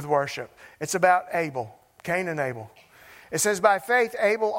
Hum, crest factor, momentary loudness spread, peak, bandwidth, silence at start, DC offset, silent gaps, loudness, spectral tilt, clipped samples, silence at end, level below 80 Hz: none; 22 dB; 16 LU; -4 dBFS; 16 kHz; 0 s; under 0.1%; none; -24 LUFS; -3.5 dB/octave; under 0.1%; 0 s; -66 dBFS